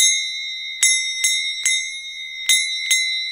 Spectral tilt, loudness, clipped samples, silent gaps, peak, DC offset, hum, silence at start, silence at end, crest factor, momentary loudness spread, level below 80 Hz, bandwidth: 7 dB/octave; -18 LUFS; under 0.1%; none; 0 dBFS; under 0.1%; 50 Hz at -70 dBFS; 0 s; 0 s; 20 dB; 10 LU; -68 dBFS; 16.5 kHz